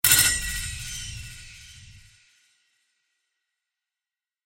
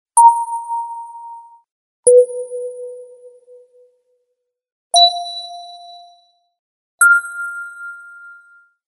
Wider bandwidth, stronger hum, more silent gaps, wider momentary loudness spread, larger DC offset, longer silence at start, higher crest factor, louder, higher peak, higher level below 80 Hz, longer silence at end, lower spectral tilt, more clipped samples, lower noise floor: first, 17 kHz vs 11.5 kHz; neither; second, none vs 1.71-2.03 s, 4.72-4.90 s, 6.59-6.98 s; first, 27 LU vs 24 LU; neither; about the same, 0.05 s vs 0.15 s; first, 28 dB vs 18 dB; second, -23 LUFS vs -14 LUFS; about the same, -2 dBFS vs 0 dBFS; first, -44 dBFS vs -78 dBFS; first, 2.45 s vs 0.6 s; first, 0.5 dB/octave vs 3.5 dB/octave; neither; first, under -90 dBFS vs -73 dBFS